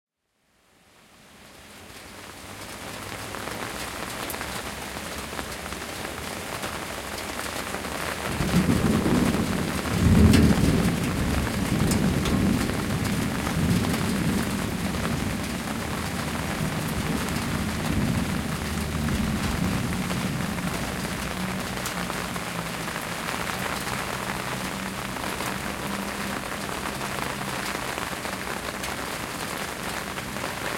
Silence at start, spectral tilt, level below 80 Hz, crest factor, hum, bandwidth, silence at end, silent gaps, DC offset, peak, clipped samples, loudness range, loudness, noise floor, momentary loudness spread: 1.2 s; -5 dB/octave; -40 dBFS; 22 dB; none; 16.5 kHz; 0 s; none; under 0.1%; -6 dBFS; under 0.1%; 10 LU; -27 LUFS; -70 dBFS; 10 LU